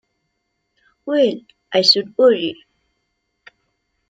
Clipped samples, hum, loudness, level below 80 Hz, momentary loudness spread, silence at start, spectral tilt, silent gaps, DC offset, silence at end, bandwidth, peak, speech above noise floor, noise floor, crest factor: under 0.1%; none; -16 LUFS; -70 dBFS; 16 LU; 1.05 s; -4 dB/octave; none; under 0.1%; 1.55 s; 9.2 kHz; -2 dBFS; 57 dB; -73 dBFS; 20 dB